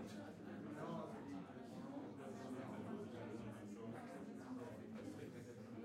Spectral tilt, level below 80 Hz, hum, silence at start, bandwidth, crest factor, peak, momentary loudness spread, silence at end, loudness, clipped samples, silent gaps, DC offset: -7 dB/octave; -82 dBFS; none; 0 s; 16 kHz; 14 dB; -36 dBFS; 4 LU; 0 s; -52 LUFS; under 0.1%; none; under 0.1%